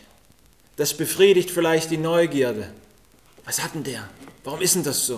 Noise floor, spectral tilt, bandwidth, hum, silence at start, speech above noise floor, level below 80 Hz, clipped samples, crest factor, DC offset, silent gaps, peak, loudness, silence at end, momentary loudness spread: -56 dBFS; -3.5 dB/octave; 16 kHz; none; 0.8 s; 35 dB; -58 dBFS; under 0.1%; 20 dB; 0.1%; none; -4 dBFS; -21 LUFS; 0 s; 22 LU